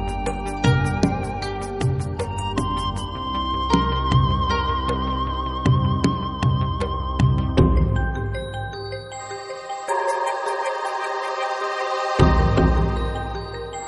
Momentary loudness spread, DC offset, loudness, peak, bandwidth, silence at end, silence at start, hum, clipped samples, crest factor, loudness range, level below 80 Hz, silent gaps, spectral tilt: 11 LU; under 0.1%; -23 LUFS; -2 dBFS; 11.5 kHz; 0 s; 0 s; none; under 0.1%; 20 dB; 4 LU; -28 dBFS; none; -6.5 dB/octave